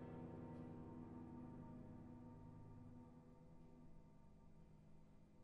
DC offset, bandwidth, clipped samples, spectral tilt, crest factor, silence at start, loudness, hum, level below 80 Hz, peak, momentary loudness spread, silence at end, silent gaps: under 0.1%; 5.4 kHz; under 0.1%; -9.5 dB/octave; 14 dB; 0 s; -60 LUFS; none; -70 dBFS; -44 dBFS; 13 LU; 0 s; none